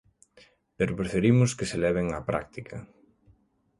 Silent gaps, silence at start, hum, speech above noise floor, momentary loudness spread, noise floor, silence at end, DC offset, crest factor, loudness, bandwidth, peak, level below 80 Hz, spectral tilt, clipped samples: none; 0.8 s; none; 38 dB; 18 LU; -64 dBFS; 0.95 s; under 0.1%; 20 dB; -26 LUFS; 11.5 kHz; -8 dBFS; -50 dBFS; -6.5 dB/octave; under 0.1%